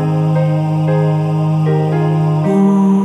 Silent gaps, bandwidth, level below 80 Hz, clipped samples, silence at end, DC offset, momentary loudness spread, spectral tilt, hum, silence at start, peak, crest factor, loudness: none; 6.4 kHz; -54 dBFS; under 0.1%; 0 s; under 0.1%; 3 LU; -9.5 dB/octave; none; 0 s; -2 dBFS; 10 dB; -14 LUFS